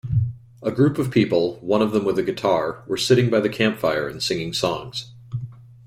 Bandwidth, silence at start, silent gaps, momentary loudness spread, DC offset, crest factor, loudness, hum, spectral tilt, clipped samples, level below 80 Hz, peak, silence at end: 16 kHz; 0.05 s; none; 14 LU; under 0.1%; 18 dB; -21 LUFS; none; -6 dB/octave; under 0.1%; -50 dBFS; -4 dBFS; 0.2 s